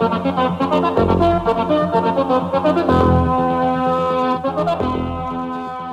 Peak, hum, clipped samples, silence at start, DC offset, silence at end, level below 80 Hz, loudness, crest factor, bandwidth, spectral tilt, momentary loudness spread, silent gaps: -4 dBFS; none; under 0.1%; 0 s; under 0.1%; 0 s; -36 dBFS; -17 LUFS; 14 dB; 11 kHz; -8 dB/octave; 8 LU; none